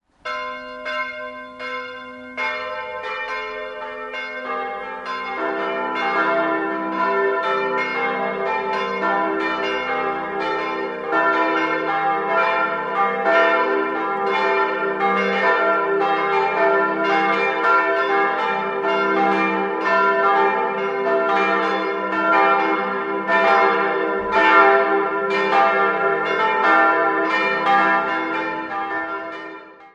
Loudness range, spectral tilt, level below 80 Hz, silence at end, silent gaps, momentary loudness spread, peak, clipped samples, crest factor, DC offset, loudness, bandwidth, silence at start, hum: 10 LU; -5 dB/octave; -62 dBFS; 0.05 s; none; 12 LU; -2 dBFS; under 0.1%; 18 dB; under 0.1%; -19 LUFS; 8.2 kHz; 0.25 s; none